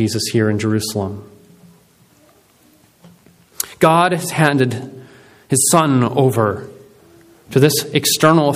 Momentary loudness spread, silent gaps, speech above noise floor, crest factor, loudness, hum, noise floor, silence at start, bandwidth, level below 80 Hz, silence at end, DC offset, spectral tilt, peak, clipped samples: 15 LU; none; 37 dB; 18 dB; -15 LUFS; none; -52 dBFS; 0 s; 16 kHz; -56 dBFS; 0 s; under 0.1%; -4.5 dB/octave; 0 dBFS; under 0.1%